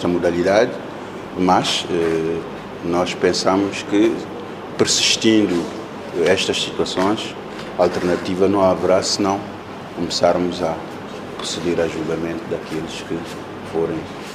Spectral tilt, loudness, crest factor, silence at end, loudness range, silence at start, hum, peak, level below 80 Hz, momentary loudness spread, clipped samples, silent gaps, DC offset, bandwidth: -4 dB/octave; -19 LUFS; 20 dB; 0 s; 4 LU; 0 s; none; 0 dBFS; -54 dBFS; 15 LU; under 0.1%; none; under 0.1%; 14.5 kHz